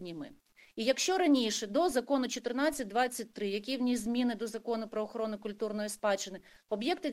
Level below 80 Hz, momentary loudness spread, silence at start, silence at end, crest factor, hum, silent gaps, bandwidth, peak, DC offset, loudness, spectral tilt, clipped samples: -68 dBFS; 10 LU; 0 s; 0 s; 18 dB; none; none; 16 kHz; -14 dBFS; under 0.1%; -33 LUFS; -3 dB/octave; under 0.1%